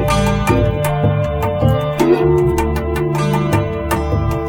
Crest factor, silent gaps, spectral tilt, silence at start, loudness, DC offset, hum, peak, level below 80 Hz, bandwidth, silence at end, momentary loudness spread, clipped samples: 14 dB; none; -7 dB/octave; 0 s; -16 LUFS; under 0.1%; none; 0 dBFS; -26 dBFS; 18 kHz; 0 s; 5 LU; under 0.1%